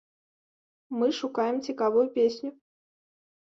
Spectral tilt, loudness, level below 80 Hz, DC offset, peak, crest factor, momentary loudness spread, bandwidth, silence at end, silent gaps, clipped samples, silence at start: -5 dB/octave; -27 LUFS; -76 dBFS; under 0.1%; -14 dBFS; 16 dB; 13 LU; 7.6 kHz; 0.9 s; none; under 0.1%; 0.9 s